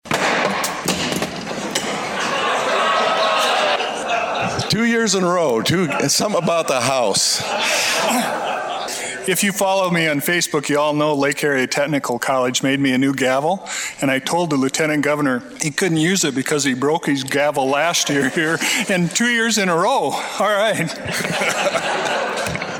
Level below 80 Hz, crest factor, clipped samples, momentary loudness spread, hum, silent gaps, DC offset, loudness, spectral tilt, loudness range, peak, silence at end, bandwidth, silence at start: -56 dBFS; 18 dB; under 0.1%; 6 LU; none; none; under 0.1%; -18 LUFS; -3 dB/octave; 2 LU; -2 dBFS; 0 s; 17 kHz; 0.05 s